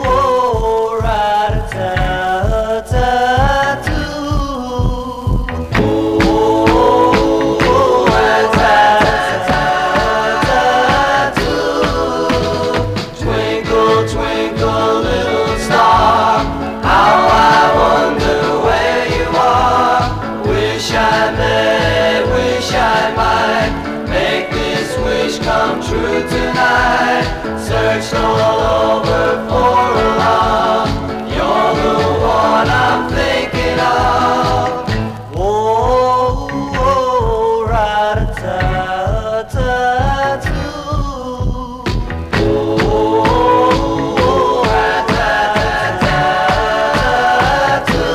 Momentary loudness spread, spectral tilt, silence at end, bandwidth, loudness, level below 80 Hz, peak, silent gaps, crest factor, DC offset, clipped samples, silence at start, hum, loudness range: 8 LU; -5.5 dB/octave; 0 s; 15.5 kHz; -13 LUFS; -26 dBFS; 0 dBFS; none; 12 dB; 0.2%; under 0.1%; 0 s; none; 5 LU